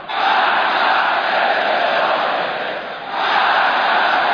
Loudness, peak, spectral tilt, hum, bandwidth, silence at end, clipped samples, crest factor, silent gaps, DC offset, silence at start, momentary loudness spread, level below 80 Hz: -16 LUFS; -4 dBFS; -3.5 dB/octave; none; 5.4 kHz; 0 s; under 0.1%; 12 dB; none; under 0.1%; 0 s; 7 LU; -62 dBFS